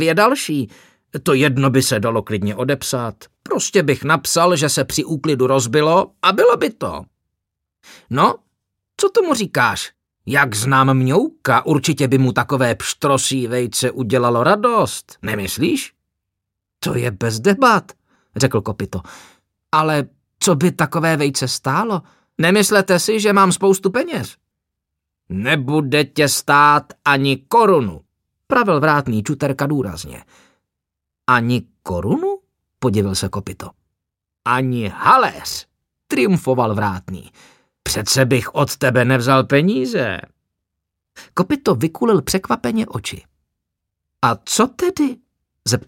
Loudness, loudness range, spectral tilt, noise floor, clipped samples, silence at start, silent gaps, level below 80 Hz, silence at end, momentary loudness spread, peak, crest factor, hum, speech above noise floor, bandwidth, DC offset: -17 LUFS; 5 LU; -4.5 dB/octave; -82 dBFS; under 0.1%; 0 s; none; -50 dBFS; 0.05 s; 13 LU; 0 dBFS; 18 dB; none; 65 dB; 17 kHz; under 0.1%